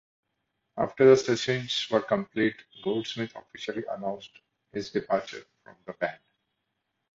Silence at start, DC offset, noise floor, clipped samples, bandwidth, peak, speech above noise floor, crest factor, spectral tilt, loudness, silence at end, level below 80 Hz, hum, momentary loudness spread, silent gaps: 0.75 s; under 0.1%; -80 dBFS; under 0.1%; 7.8 kHz; -6 dBFS; 53 dB; 22 dB; -5 dB/octave; -28 LUFS; 1 s; -66 dBFS; none; 19 LU; none